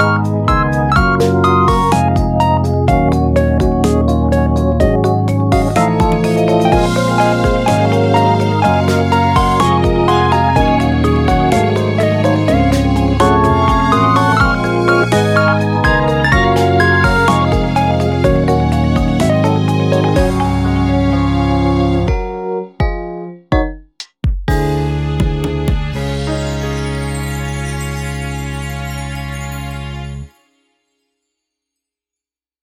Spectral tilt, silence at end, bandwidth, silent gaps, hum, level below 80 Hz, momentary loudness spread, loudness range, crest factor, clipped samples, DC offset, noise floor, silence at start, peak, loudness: -6.5 dB/octave; 2.35 s; 15.5 kHz; none; none; -22 dBFS; 10 LU; 9 LU; 12 dB; under 0.1%; under 0.1%; -88 dBFS; 0 s; 0 dBFS; -13 LUFS